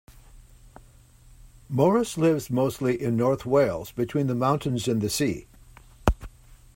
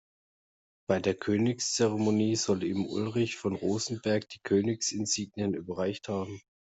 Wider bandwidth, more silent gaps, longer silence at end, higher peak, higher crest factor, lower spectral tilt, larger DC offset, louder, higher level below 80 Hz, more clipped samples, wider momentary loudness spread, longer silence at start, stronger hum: first, 16.5 kHz vs 8.2 kHz; neither; second, 0.2 s vs 0.35 s; first, -4 dBFS vs -12 dBFS; about the same, 22 dB vs 18 dB; first, -6 dB/octave vs -4.5 dB/octave; neither; first, -25 LUFS vs -30 LUFS; first, -40 dBFS vs -68 dBFS; neither; about the same, 7 LU vs 7 LU; second, 0.1 s vs 0.9 s; neither